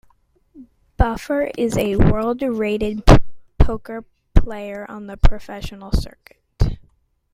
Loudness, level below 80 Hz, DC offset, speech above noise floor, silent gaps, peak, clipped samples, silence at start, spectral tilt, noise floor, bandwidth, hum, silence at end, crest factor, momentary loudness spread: -20 LUFS; -22 dBFS; under 0.1%; 41 dB; none; 0 dBFS; under 0.1%; 0.6 s; -7 dB/octave; -59 dBFS; 13.5 kHz; none; 0.6 s; 18 dB; 17 LU